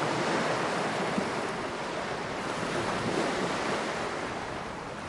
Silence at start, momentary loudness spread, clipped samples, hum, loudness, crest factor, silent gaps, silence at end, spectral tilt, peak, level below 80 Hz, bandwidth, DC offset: 0 s; 6 LU; under 0.1%; none; -31 LUFS; 16 dB; none; 0 s; -4 dB/octave; -16 dBFS; -58 dBFS; 11.5 kHz; under 0.1%